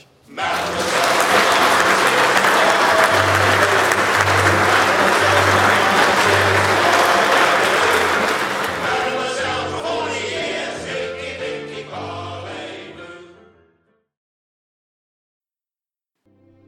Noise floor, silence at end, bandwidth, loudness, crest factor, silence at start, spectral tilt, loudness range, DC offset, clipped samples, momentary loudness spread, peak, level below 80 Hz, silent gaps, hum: under -90 dBFS; 3.4 s; 17.5 kHz; -15 LUFS; 18 dB; 0.3 s; -3 dB/octave; 16 LU; under 0.1%; under 0.1%; 15 LU; 0 dBFS; -58 dBFS; none; none